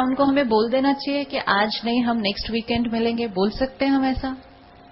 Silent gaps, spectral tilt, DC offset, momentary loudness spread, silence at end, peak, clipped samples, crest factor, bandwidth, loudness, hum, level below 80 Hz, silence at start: none; -9 dB/octave; under 0.1%; 5 LU; 0.5 s; -6 dBFS; under 0.1%; 16 dB; 5.8 kHz; -22 LUFS; none; -44 dBFS; 0 s